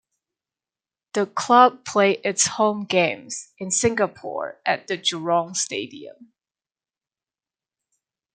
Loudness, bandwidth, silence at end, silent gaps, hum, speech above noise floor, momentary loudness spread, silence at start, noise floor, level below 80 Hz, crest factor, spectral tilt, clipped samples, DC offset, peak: -21 LUFS; 9.6 kHz; 2.1 s; none; none; over 68 dB; 14 LU; 1.15 s; under -90 dBFS; -66 dBFS; 22 dB; -2.5 dB/octave; under 0.1%; under 0.1%; -2 dBFS